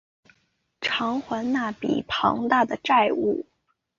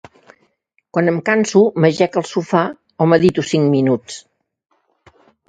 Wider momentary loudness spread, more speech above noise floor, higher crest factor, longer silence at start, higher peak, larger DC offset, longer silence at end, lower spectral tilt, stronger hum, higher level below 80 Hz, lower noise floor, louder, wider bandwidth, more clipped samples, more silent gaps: about the same, 8 LU vs 10 LU; about the same, 47 dB vs 49 dB; about the same, 20 dB vs 18 dB; second, 0.8 s vs 0.95 s; second, -6 dBFS vs 0 dBFS; neither; second, 0.55 s vs 1.3 s; about the same, -5 dB/octave vs -6 dB/octave; neither; about the same, -60 dBFS vs -58 dBFS; first, -70 dBFS vs -64 dBFS; second, -24 LUFS vs -16 LUFS; second, 7.4 kHz vs 9.4 kHz; neither; neither